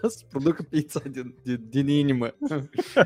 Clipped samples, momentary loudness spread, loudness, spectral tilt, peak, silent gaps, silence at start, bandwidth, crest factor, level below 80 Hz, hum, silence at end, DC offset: under 0.1%; 10 LU; -27 LUFS; -6.5 dB/octave; -4 dBFS; none; 0.05 s; 15.5 kHz; 22 dB; -62 dBFS; none; 0 s; under 0.1%